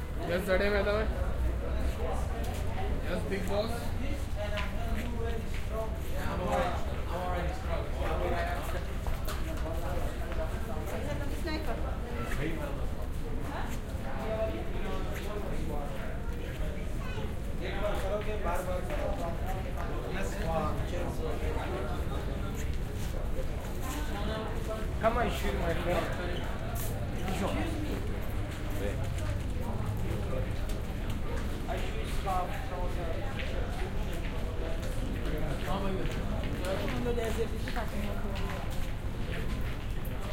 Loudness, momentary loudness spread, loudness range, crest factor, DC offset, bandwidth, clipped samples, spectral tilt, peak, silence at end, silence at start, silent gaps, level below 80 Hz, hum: -35 LUFS; 5 LU; 3 LU; 18 dB; under 0.1%; 16.5 kHz; under 0.1%; -6 dB/octave; -14 dBFS; 0 s; 0 s; none; -34 dBFS; none